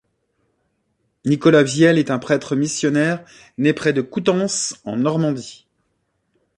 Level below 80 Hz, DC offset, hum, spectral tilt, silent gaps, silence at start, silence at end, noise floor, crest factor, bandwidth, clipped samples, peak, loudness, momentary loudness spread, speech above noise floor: -62 dBFS; under 0.1%; none; -5 dB/octave; none; 1.25 s; 1.05 s; -70 dBFS; 18 dB; 11.5 kHz; under 0.1%; -2 dBFS; -18 LUFS; 12 LU; 52 dB